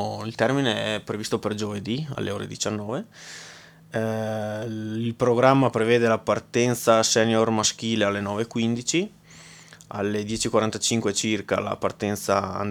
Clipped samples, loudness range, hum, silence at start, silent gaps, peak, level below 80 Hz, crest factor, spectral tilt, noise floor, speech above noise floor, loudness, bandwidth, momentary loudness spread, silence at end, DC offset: under 0.1%; 9 LU; none; 0 s; none; -2 dBFS; -60 dBFS; 22 dB; -4 dB/octave; -47 dBFS; 23 dB; -24 LUFS; 18.5 kHz; 11 LU; 0 s; under 0.1%